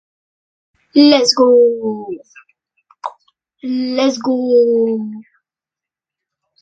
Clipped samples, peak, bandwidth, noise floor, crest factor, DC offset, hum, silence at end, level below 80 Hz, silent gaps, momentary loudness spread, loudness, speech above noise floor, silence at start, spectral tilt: under 0.1%; 0 dBFS; 8.8 kHz; -87 dBFS; 16 dB; under 0.1%; none; 1.4 s; -66 dBFS; none; 20 LU; -13 LUFS; 74 dB; 0.95 s; -4 dB/octave